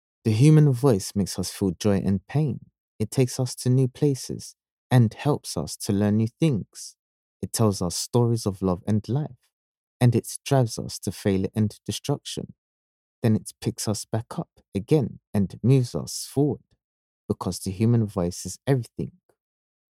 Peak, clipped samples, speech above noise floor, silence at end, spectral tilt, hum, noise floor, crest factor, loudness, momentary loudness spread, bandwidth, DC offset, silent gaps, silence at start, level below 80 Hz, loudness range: -6 dBFS; under 0.1%; over 66 dB; 0.9 s; -6.5 dB/octave; none; under -90 dBFS; 20 dB; -25 LUFS; 13 LU; 15.5 kHz; under 0.1%; 2.80-2.99 s, 4.71-4.90 s, 6.99-7.40 s, 9.53-10.00 s, 12.58-13.22 s, 14.68-14.72 s, 15.27-15.33 s, 16.84-17.29 s; 0.25 s; -56 dBFS; 4 LU